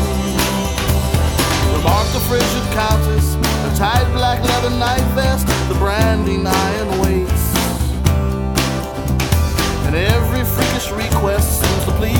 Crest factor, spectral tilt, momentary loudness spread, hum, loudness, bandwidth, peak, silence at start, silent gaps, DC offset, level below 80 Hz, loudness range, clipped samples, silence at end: 16 dB; -5 dB/octave; 3 LU; none; -16 LUFS; 18.5 kHz; 0 dBFS; 0 s; none; under 0.1%; -22 dBFS; 1 LU; under 0.1%; 0 s